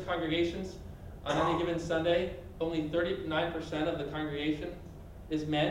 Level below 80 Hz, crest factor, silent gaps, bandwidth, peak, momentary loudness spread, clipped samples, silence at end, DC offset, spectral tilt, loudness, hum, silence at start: -50 dBFS; 16 dB; none; 15.5 kHz; -18 dBFS; 13 LU; under 0.1%; 0 s; under 0.1%; -6 dB/octave; -33 LUFS; none; 0 s